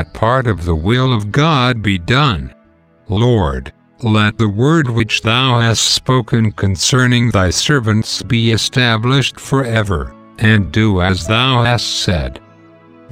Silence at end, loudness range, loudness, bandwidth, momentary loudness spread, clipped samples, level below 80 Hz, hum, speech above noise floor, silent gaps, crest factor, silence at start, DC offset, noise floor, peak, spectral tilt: 0.75 s; 3 LU; -14 LUFS; 15.5 kHz; 6 LU; under 0.1%; -34 dBFS; none; 36 dB; none; 14 dB; 0 s; under 0.1%; -50 dBFS; 0 dBFS; -5 dB/octave